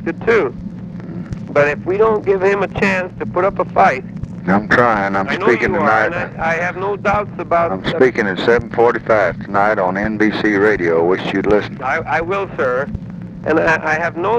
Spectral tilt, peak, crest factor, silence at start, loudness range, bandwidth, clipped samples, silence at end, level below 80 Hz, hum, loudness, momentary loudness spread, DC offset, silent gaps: -6.5 dB/octave; 0 dBFS; 16 dB; 0 s; 2 LU; 9.4 kHz; under 0.1%; 0 s; -40 dBFS; none; -16 LUFS; 9 LU; under 0.1%; none